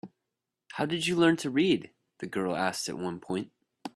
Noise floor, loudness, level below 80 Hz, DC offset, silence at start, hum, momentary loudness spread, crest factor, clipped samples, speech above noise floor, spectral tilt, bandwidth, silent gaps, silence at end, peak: -86 dBFS; -29 LUFS; -68 dBFS; under 0.1%; 0.05 s; none; 18 LU; 20 dB; under 0.1%; 58 dB; -4.5 dB/octave; 13 kHz; none; 0.1 s; -10 dBFS